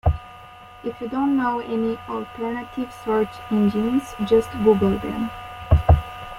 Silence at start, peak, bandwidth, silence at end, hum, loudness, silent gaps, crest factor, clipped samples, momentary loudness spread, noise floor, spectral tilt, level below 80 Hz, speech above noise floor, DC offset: 0.05 s; -2 dBFS; 15.5 kHz; 0 s; none; -22 LUFS; none; 18 dB; under 0.1%; 14 LU; -43 dBFS; -8 dB/octave; -32 dBFS; 21 dB; under 0.1%